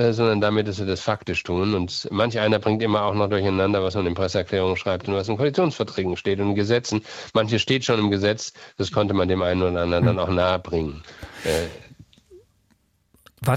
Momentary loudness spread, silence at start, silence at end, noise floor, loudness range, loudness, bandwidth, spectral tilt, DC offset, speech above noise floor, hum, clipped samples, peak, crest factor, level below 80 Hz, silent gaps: 7 LU; 0 s; 0 s; -64 dBFS; 2 LU; -23 LUFS; 15.5 kHz; -6 dB/octave; under 0.1%; 42 dB; none; under 0.1%; -6 dBFS; 18 dB; -48 dBFS; none